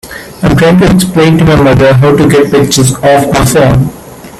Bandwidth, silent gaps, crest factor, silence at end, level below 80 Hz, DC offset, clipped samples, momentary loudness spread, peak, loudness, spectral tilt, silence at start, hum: 15 kHz; none; 6 dB; 0 s; -26 dBFS; under 0.1%; 0.3%; 5 LU; 0 dBFS; -6 LUFS; -5.5 dB/octave; 0.05 s; none